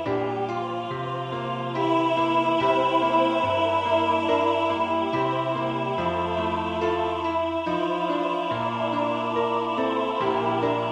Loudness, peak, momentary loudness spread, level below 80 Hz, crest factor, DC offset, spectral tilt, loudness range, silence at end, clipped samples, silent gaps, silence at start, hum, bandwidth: -24 LUFS; -10 dBFS; 7 LU; -58 dBFS; 14 dB; under 0.1%; -6.5 dB/octave; 3 LU; 0 s; under 0.1%; none; 0 s; none; 9.8 kHz